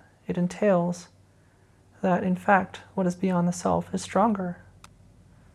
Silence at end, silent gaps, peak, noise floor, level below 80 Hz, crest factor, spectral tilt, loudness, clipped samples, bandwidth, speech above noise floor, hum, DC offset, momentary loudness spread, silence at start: 0.95 s; none; -6 dBFS; -58 dBFS; -60 dBFS; 20 dB; -6.5 dB/octave; -26 LUFS; under 0.1%; 12 kHz; 34 dB; none; under 0.1%; 11 LU; 0.3 s